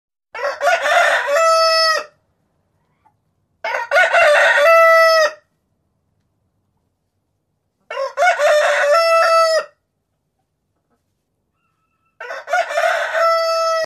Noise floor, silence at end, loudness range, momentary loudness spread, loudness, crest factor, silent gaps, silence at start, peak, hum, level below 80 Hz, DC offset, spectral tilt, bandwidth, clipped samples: -71 dBFS; 0 s; 10 LU; 15 LU; -14 LUFS; 14 dB; none; 0.35 s; -2 dBFS; none; -70 dBFS; under 0.1%; 1.5 dB/octave; 14 kHz; under 0.1%